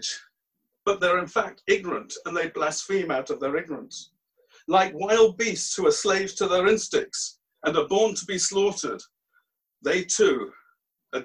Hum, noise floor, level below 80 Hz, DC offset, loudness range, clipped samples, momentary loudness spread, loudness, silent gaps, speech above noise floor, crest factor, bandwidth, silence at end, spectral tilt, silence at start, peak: none; -80 dBFS; -64 dBFS; under 0.1%; 4 LU; under 0.1%; 12 LU; -24 LUFS; none; 55 dB; 18 dB; 11 kHz; 0 s; -2.5 dB/octave; 0 s; -6 dBFS